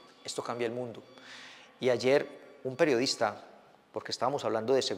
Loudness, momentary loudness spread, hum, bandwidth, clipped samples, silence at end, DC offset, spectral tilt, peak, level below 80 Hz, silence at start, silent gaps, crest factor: -31 LUFS; 20 LU; none; 15.5 kHz; under 0.1%; 0 s; under 0.1%; -4 dB/octave; -12 dBFS; -82 dBFS; 0.25 s; none; 20 dB